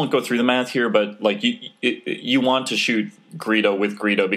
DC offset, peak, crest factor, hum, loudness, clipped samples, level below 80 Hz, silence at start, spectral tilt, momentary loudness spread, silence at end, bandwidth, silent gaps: under 0.1%; -2 dBFS; 18 dB; none; -20 LUFS; under 0.1%; -82 dBFS; 0 s; -4.5 dB/octave; 6 LU; 0 s; 15 kHz; none